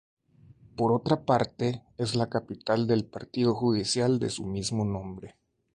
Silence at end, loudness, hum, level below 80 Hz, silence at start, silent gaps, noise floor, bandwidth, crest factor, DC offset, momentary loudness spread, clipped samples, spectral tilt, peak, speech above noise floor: 0.45 s; -28 LUFS; none; -56 dBFS; 0.75 s; none; -56 dBFS; 11.5 kHz; 20 dB; under 0.1%; 9 LU; under 0.1%; -5.5 dB/octave; -8 dBFS; 29 dB